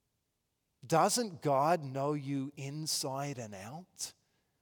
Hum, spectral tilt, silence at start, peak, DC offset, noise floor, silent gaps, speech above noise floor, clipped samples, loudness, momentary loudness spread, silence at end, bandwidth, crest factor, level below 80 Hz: none; -4 dB/octave; 0.85 s; -14 dBFS; under 0.1%; -83 dBFS; none; 49 dB; under 0.1%; -34 LUFS; 14 LU; 0.5 s; over 20 kHz; 20 dB; -82 dBFS